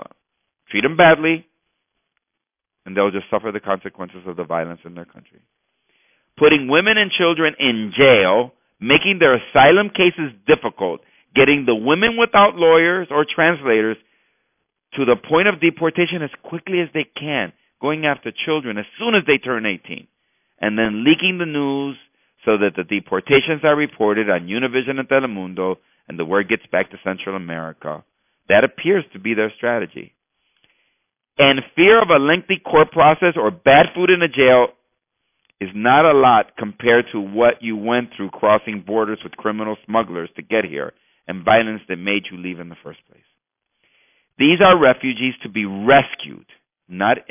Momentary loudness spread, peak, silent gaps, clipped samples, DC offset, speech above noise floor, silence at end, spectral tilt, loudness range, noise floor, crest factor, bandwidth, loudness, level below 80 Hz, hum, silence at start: 17 LU; -2 dBFS; none; under 0.1%; under 0.1%; 65 dB; 0.1 s; -9 dB/octave; 8 LU; -82 dBFS; 16 dB; 3.7 kHz; -16 LUFS; -54 dBFS; none; 0 s